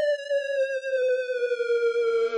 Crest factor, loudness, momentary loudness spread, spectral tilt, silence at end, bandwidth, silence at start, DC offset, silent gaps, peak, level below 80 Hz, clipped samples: 6 dB; -26 LUFS; 3 LU; 0.5 dB/octave; 0 s; 10 kHz; 0 s; under 0.1%; none; -20 dBFS; -88 dBFS; under 0.1%